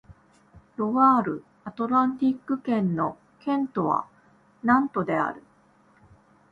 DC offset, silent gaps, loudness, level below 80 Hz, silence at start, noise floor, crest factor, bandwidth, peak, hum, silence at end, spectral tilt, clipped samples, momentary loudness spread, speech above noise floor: under 0.1%; none; -25 LUFS; -64 dBFS; 0.1 s; -60 dBFS; 20 dB; 5.2 kHz; -6 dBFS; none; 1.1 s; -9 dB/octave; under 0.1%; 14 LU; 36 dB